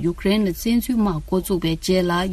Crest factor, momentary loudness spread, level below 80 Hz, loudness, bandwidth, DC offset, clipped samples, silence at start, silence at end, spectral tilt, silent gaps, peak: 12 dB; 3 LU; -36 dBFS; -21 LUFS; 14.5 kHz; under 0.1%; under 0.1%; 0 s; 0 s; -5.5 dB/octave; none; -8 dBFS